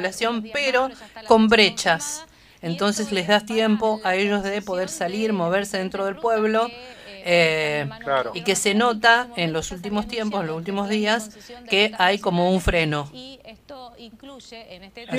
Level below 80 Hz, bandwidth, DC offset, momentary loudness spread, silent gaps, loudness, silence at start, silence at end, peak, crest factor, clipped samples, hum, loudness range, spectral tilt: -44 dBFS; 15.5 kHz; under 0.1%; 22 LU; none; -21 LUFS; 0 s; 0 s; -2 dBFS; 22 dB; under 0.1%; none; 3 LU; -4 dB/octave